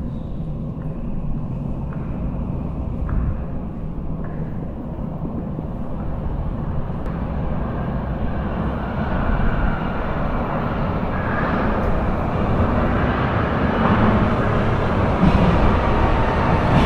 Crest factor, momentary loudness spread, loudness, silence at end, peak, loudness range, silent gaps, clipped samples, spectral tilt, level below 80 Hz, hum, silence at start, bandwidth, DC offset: 18 dB; 11 LU; -22 LUFS; 0 s; -2 dBFS; 9 LU; none; under 0.1%; -9 dB/octave; -26 dBFS; none; 0 s; 6.8 kHz; under 0.1%